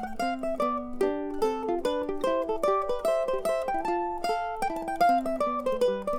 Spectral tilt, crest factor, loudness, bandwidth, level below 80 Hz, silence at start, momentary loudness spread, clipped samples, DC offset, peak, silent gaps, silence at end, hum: -4.5 dB/octave; 16 dB; -28 LUFS; 18.5 kHz; -48 dBFS; 0 s; 4 LU; under 0.1%; under 0.1%; -12 dBFS; none; 0 s; none